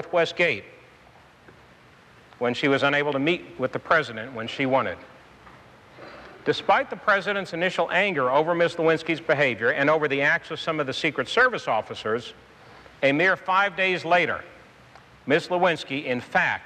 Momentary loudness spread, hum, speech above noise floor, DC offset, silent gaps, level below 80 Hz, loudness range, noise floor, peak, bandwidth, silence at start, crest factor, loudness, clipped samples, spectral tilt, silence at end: 10 LU; none; 29 dB; under 0.1%; none; -64 dBFS; 4 LU; -53 dBFS; -8 dBFS; 10 kHz; 0 s; 16 dB; -23 LUFS; under 0.1%; -5 dB/octave; 0 s